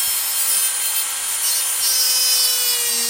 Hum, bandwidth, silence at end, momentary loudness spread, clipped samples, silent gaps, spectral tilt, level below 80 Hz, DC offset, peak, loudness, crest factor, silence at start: none; 16.5 kHz; 0 s; 5 LU; under 0.1%; none; 4 dB/octave; -62 dBFS; under 0.1%; -4 dBFS; -16 LUFS; 14 dB; 0 s